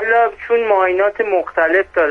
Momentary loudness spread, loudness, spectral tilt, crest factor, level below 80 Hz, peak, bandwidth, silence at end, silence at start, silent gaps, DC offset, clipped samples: 4 LU; -15 LUFS; -5.5 dB/octave; 12 dB; -50 dBFS; -2 dBFS; 5.6 kHz; 0 s; 0 s; none; under 0.1%; under 0.1%